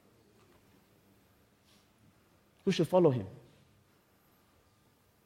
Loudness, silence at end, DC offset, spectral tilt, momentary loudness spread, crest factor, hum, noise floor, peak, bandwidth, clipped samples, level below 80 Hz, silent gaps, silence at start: -30 LUFS; 1.9 s; under 0.1%; -7 dB/octave; 21 LU; 24 dB; none; -68 dBFS; -12 dBFS; 16 kHz; under 0.1%; -74 dBFS; none; 2.65 s